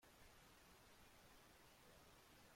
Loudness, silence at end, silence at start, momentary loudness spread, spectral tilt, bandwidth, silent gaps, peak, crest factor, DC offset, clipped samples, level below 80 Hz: -68 LUFS; 0 s; 0 s; 0 LU; -3 dB/octave; 16.5 kHz; none; -56 dBFS; 12 dB; under 0.1%; under 0.1%; -78 dBFS